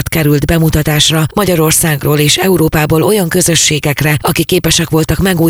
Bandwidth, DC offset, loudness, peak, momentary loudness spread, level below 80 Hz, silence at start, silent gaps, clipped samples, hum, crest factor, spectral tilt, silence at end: over 20 kHz; under 0.1%; -10 LUFS; 0 dBFS; 3 LU; -28 dBFS; 0 s; none; under 0.1%; none; 10 dB; -4 dB/octave; 0 s